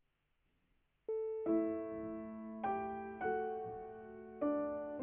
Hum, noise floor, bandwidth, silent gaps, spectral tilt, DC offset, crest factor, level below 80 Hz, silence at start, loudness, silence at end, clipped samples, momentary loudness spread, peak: none; -80 dBFS; 3.5 kHz; none; -2 dB/octave; under 0.1%; 16 dB; -70 dBFS; 1.1 s; -41 LUFS; 0 s; under 0.1%; 13 LU; -26 dBFS